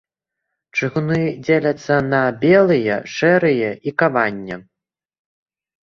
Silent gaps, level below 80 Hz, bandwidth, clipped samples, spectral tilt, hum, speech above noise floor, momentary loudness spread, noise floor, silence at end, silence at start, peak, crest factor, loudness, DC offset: none; -56 dBFS; 7.4 kHz; under 0.1%; -7 dB/octave; none; 63 dB; 9 LU; -80 dBFS; 1.3 s; 0.75 s; -2 dBFS; 18 dB; -17 LUFS; under 0.1%